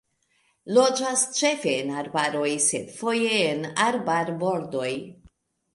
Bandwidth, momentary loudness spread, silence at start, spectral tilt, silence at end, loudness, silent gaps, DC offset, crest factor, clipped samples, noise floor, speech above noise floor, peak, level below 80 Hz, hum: 11.5 kHz; 8 LU; 0.65 s; -2.5 dB/octave; 0.65 s; -24 LUFS; none; under 0.1%; 18 dB; under 0.1%; -68 dBFS; 44 dB; -6 dBFS; -68 dBFS; none